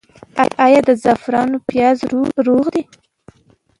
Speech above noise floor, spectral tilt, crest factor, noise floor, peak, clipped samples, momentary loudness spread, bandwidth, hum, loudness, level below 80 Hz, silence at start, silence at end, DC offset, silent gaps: 41 dB; -6 dB/octave; 16 dB; -55 dBFS; 0 dBFS; under 0.1%; 7 LU; 11.5 kHz; none; -15 LUFS; -54 dBFS; 0.35 s; 1 s; under 0.1%; none